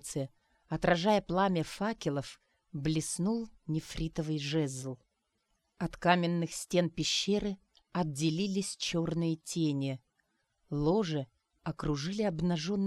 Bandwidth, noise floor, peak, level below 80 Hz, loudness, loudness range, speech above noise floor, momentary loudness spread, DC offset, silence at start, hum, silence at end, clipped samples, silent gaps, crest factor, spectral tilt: 13.5 kHz; -79 dBFS; -10 dBFS; -56 dBFS; -33 LUFS; 4 LU; 47 dB; 12 LU; under 0.1%; 0.05 s; none; 0 s; under 0.1%; none; 22 dB; -5 dB/octave